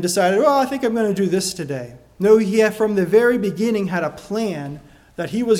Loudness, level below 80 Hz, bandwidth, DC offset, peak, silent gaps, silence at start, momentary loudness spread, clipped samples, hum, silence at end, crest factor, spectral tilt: -18 LUFS; -54 dBFS; 16 kHz; under 0.1%; -2 dBFS; none; 0 s; 15 LU; under 0.1%; none; 0 s; 16 dB; -5 dB/octave